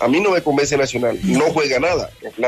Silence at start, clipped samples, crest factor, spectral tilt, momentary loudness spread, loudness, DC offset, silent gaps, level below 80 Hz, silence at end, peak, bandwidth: 0 s; under 0.1%; 12 dB; -4.5 dB/octave; 4 LU; -17 LUFS; under 0.1%; none; -46 dBFS; 0 s; -6 dBFS; 14 kHz